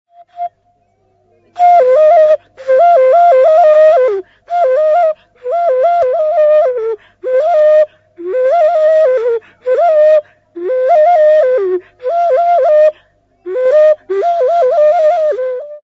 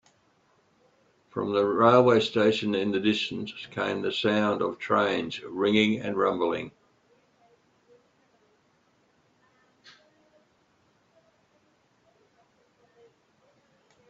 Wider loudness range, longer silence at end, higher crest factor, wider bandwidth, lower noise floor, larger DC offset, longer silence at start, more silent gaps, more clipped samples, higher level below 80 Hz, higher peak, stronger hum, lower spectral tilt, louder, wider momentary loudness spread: second, 4 LU vs 8 LU; second, 0.05 s vs 7.4 s; second, 10 dB vs 24 dB; about the same, 7.4 kHz vs 7.8 kHz; second, -57 dBFS vs -67 dBFS; neither; second, 0.35 s vs 1.35 s; neither; neither; first, -62 dBFS vs -68 dBFS; first, 0 dBFS vs -6 dBFS; neither; second, -4.5 dB/octave vs -6 dB/octave; first, -10 LUFS vs -25 LUFS; about the same, 12 LU vs 14 LU